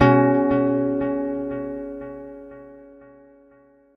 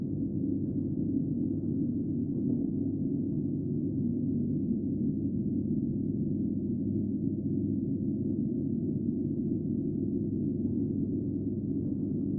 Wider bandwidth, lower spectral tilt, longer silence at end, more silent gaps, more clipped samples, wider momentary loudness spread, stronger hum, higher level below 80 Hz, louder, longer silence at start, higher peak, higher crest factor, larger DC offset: first, 6 kHz vs 1.1 kHz; second, -9.5 dB/octave vs -18 dB/octave; first, 1.1 s vs 0 s; neither; neither; first, 23 LU vs 1 LU; neither; about the same, -50 dBFS vs -54 dBFS; first, -22 LUFS vs -32 LUFS; about the same, 0 s vs 0 s; first, -2 dBFS vs -18 dBFS; first, 20 dB vs 12 dB; neither